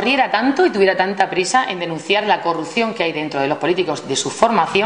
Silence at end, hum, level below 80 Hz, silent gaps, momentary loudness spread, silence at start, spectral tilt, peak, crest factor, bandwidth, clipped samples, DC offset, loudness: 0 s; none; -60 dBFS; none; 6 LU; 0 s; -3.5 dB/octave; 0 dBFS; 18 dB; 10.5 kHz; under 0.1%; 0.1%; -17 LUFS